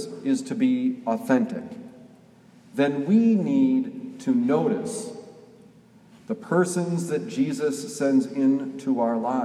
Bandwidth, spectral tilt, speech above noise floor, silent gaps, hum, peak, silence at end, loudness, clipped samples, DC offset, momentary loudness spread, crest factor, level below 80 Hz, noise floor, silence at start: 13 kHz; -6.5 dB/octave; 29 dB; none; none; -8 dBFS; 0 s; -24 LUFS; under 0.1%; under 0.1%; 13 LU; 18 dB; -74 dBFS; -53 dBFS; 0 s